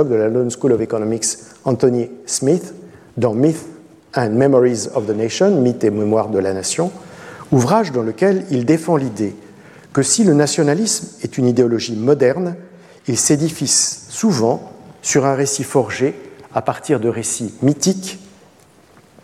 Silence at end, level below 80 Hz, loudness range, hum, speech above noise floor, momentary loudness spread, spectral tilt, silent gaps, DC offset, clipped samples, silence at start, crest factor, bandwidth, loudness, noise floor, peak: 1 s; -60 dBFS; 3 LU; none; 32 dB; 11 LU; -4.5 dB/octave; none; under 0.1%; under 0.1%; 0 s; 16 dB; 15 kHz; -17 LUFS; -49 dBFS; -2 dBFS